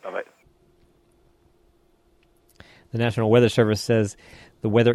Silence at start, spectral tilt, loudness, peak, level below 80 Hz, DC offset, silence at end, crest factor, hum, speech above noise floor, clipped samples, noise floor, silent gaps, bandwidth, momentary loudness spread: 0.05 s; -6.5 dB/octave; -22 LUFS; -6 dBFS; -58 dBFS; under 0.1%; 0 s; 18 dB; none; 41 dB; under 0.1%; -61 dBFS; none; 13 kHz; 17 LU